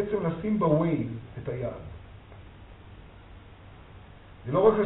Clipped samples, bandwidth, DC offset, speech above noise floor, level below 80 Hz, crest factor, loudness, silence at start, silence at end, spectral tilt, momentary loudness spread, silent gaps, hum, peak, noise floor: under 0.1%; 4.1 kHz; under 0.1%; 23 dB; -52 dBFS; 24 dB; -28 LUFS; 0 s; 0 s; -8 dB/octave; 26 LU; none; none; -6 dBFS; -49 dBFS